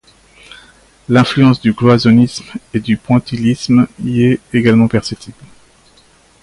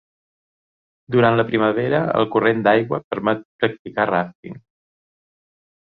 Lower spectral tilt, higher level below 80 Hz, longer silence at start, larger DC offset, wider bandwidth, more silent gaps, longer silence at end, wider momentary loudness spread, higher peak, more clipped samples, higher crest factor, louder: second, -7 dB/octave vs -9.5 dB/octave; first, -44 dBFS vs -58 dBFS; about the same, 1.1 s vs 1.1 s; neither; first, 11.5 kHz vs 4.9 kHz; second, none vs 3.04-3.11 s, 3.45-3.59 s, 3.79-3.85 s, 4.35-4.43 s; second, 1.1 s vs 1.4 s; first, 11 LU vs 8 LU; about the same, 0 dBFS vs -2 dBFS; neither; second, 14 dB vs 20 dB; first, -12 LUFS vs -19 LUFS